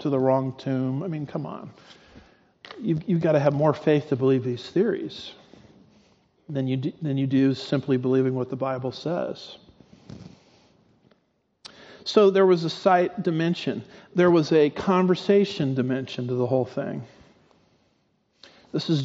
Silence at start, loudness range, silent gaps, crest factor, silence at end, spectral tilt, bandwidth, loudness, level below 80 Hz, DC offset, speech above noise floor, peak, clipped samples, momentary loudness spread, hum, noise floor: 0 s; 8 LU; none; 20 dB; 0 s; -6 dB/octave; 7.8 kHz; -24 LUFS; -66 dBFS; under 0.1%; 47 dB; -6 dBFS; under 0.1%; 16 LU; none; -70 dBFS